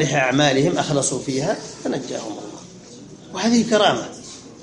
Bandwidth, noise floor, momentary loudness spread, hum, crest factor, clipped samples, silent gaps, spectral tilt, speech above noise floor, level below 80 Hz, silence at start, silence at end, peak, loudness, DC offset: 11 kHz; -41 dBFS; 22 LU; none; 18 dB; under 0.1%; none; -4 dB/octave; 21 dB; -58 dBFS; 0 s; 0 s; -2 dBFS; -20 LUFS; under 0.1%